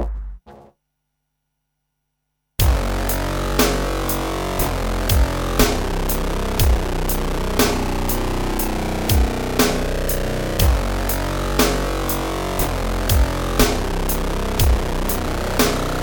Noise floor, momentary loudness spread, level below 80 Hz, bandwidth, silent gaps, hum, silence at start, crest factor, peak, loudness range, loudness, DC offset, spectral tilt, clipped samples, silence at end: -75 dBFS; 5 LU; -24 dBFS; over 20 kHz; none; none; 0 s; 18 dB; -2 dBFS; 2 LU; -20 LUFS; under 0.1%; -4.5 dB/octave; under 0.1%; 0 s